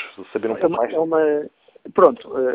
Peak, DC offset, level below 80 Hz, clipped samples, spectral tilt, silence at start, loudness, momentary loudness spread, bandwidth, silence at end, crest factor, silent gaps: 0 dBFS; under 0.1%; -62 dBFS; under 0.1%; -9.5 dB/octave; 0 s; -20 LUFS; 11 LU; 4 kHz; 0 s; 20 dB; none